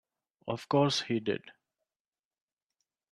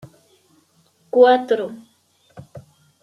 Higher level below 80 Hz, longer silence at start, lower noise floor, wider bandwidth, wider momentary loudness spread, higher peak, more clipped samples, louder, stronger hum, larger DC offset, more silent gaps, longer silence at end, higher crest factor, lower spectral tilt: second, -76 dBFS vs -68 dBFS; second, 0.45 s vs 1.15 s; first, under -90 dBFS vs -60 dBFS; first, 12.5 kHz vs 6.8 kHz; second, 12 LU vs 19 LU; second, -14 dBFS vs -2 dBFS; neither; second, -31 LUFS vs -16 LUFS; neither; neither; neither; first, 1.6 s vs 0.4 s; about the same, 20 dB vs 20 dB; about the same, -5 dB/octave vs -6 dB/octave